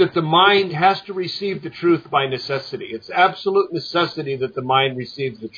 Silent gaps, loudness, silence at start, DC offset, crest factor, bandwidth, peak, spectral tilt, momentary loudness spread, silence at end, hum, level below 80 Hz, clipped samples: none; -19 LUFS; 0 s; under 0.1%; 18 dB; 5.2 kHz; -2 dBFS; -6.5 dB/octave; 12 LU; 0 s; none; -66 dBFS; under 0.1%